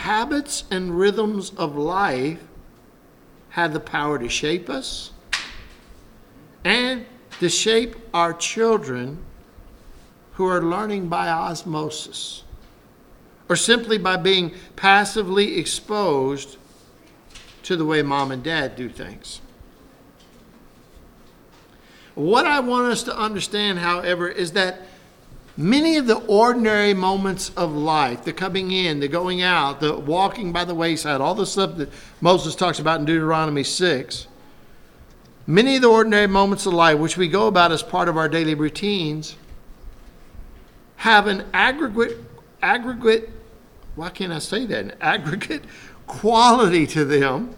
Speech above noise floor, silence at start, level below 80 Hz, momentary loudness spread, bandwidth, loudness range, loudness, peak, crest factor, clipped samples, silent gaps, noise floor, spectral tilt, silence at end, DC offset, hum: 30 dB; 0 s; -48 dBFS; 15 LU; 17.5 kHz; 8 LU; -20 LUFS; 0 dBFS; 22 dB; under 0.1%; none; -50 dBFS; -4 dB/octave; 0 s; under 0.1%; none